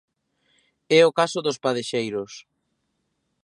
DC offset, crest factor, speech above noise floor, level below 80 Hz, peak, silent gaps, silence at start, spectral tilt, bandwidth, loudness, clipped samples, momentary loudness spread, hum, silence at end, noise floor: under 0.1%; 20 dB; 53 dB; -74 dBFS; -4 dBFS; none; 0.9 s; -4 dB/octave; 11.5 kHz; -22 LUFS; under 0.1%; 17 LU; none; 1.05 s; -74 dBFS